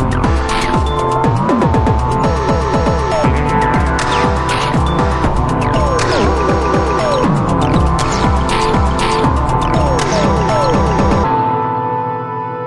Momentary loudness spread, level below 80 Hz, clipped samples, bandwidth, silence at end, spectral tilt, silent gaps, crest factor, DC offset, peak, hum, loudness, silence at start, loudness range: 2 LU; -22 dBFS; under 0.1%; 11.5 kHz; 0 s; -6 dB/octave; none; 12 dB; under 0.1%; 0 dBFS; none; -14 LUFS; 0 s; 1 LU